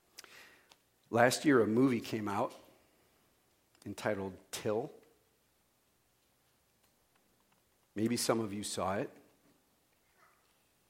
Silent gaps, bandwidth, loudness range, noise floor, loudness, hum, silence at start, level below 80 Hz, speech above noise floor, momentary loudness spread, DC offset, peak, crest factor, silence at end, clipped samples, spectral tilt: none; 16.5 kHz; 12 LU; -74 dBFS; -33 LUFS; none; 0.3 s; -78 dBFS; 41 dB; 20 LU; under 0.1%; -12 dBFS; 26 dB; 1.8 s; under 0.1%; -4.5 dB/octave